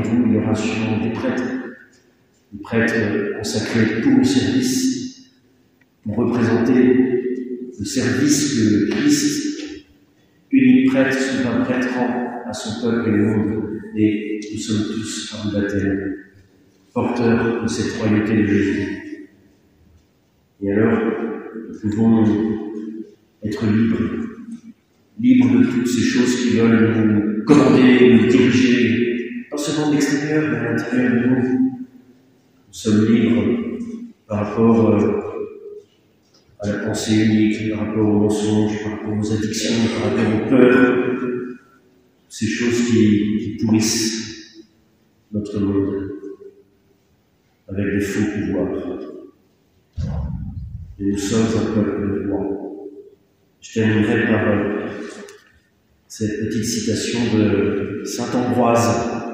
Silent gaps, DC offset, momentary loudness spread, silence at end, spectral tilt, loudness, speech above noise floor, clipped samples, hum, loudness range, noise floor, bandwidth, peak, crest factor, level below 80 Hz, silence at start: none; under 0.1%; 16 LU; 0 s; -5.5 dB/octave; -18 LUFS; 43 dB; under 0.1%; none; 8 LU; -60 dBFS; 16 kHz; 0 dBFS; 18 dB; -48 dBFS; 0 s